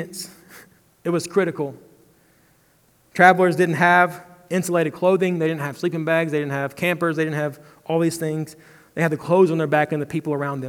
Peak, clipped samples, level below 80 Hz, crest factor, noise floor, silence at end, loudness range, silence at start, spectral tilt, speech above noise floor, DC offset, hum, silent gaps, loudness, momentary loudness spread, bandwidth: 0 dBFS; under 0.1%; -68 dBFS; 22 dB; -59 dBFS; 0 s; 5 LU; 0 s; -6 dB/octave; 39 dB; under 0.1%; none; none; -20 LUFS; 15 LU; 18.5 kHz